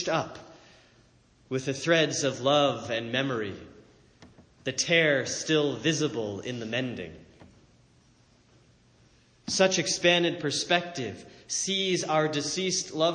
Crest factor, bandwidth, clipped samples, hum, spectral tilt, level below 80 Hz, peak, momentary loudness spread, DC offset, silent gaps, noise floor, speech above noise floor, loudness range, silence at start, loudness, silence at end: 20 dB; 10 kHz; under 0.1%; none; -3 dB/octave; -66 dBFS; -8 dBFS; 14 LU; under 0.1%; none; -61 dBFS; 34 dB; 6 LU; 0 s; -27 LUFS; 0 s